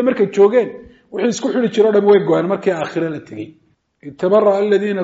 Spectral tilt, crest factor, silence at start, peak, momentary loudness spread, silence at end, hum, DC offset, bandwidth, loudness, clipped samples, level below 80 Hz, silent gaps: -5.5 dB/octave; 14 dB; 0 s; -2 dBFS; 16 LU; 0 s; none; under 0.1%; 7.8 kHz; -15 LUFS; under 0.1%; -62 dBFS; none